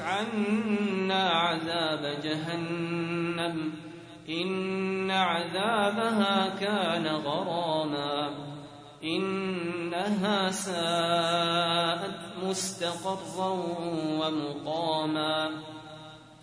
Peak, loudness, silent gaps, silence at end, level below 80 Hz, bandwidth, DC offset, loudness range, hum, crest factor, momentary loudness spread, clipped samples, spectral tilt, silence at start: -12 dBFS; -29 LUFS; none; 0.05 s; -70 dBFS; 11 kHz; under 0.1%; 4 LU; none; 18 dB; 10 LU; under 0.1%; -4.5 dB/octave; 0 s